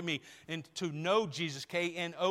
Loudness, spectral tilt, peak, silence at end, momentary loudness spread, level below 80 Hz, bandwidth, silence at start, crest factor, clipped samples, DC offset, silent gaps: -35 LUFS; -4.5 dB/octave; -16 dBFS; 0 s; 10 LU; -78 dBFS; 16 kHz; 0 s; 18 dB; under 0.1%; under 0.1%; none